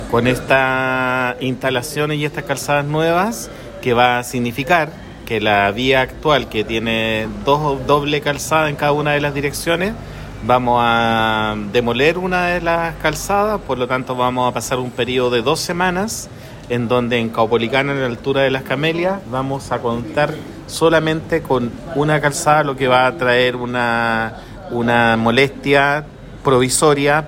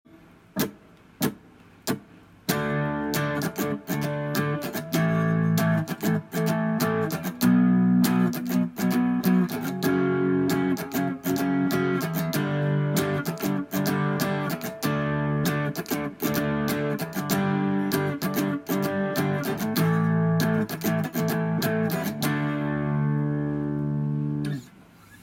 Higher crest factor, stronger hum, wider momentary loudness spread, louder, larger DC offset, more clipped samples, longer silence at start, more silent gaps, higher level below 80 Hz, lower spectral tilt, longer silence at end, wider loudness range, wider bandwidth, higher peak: about the same, 16 dB vs 18 dB; neither; about the same, 8 LU vs 7 LU; first, -17 LUFS vs -26 LUFS; neither; neither; second, 0 s vs 0.15 s; neither; first, -40 dBFS vs -56 dBFS; second, -4.5 dB/octave vs -6 dB/octave; about the same, 0 s vs 0.05 s; about the same, 3 LU vs 5 LU; about the same, 16.5 kHz vs 16.5 kHz; first, 0 dBFS vs -6 dBFS